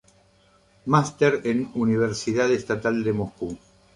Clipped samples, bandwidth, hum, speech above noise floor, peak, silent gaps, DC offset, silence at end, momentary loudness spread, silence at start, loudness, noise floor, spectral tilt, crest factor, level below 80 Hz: under 0.1%; 11 kHz; none; 36 dB; -4 dBFS; none; under 0.1%; 0.4 s; 13 LU; 0.85 s; -24 LUFS; -59 dBFS; -6 dB/octave; 20 dB; -56 dBFS